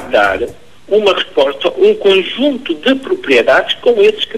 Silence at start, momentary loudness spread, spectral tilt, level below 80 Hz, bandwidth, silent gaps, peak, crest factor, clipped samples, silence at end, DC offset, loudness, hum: 0 s; 6 LU; -4 dB/octave; -46 dBFS; 12.5 kHz; none; 0 dBFS; 12 dB; under 0.1%; 0 s; 1%; -12 LUFS; none